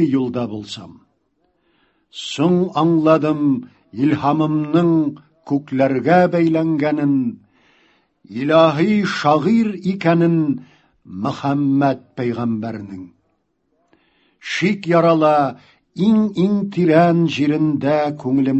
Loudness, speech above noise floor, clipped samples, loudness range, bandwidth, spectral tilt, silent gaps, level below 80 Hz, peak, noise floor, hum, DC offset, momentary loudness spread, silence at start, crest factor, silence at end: -17 LUFS; 51 dB; under 0.1%; 6 LU; 8.4 kHz; -7.5 dB/octave; none; -58 dBFS; 0 dBFS; -67 dBFS; none; under 0.1%; 14 LU; 0 s; 18 dB; 0 s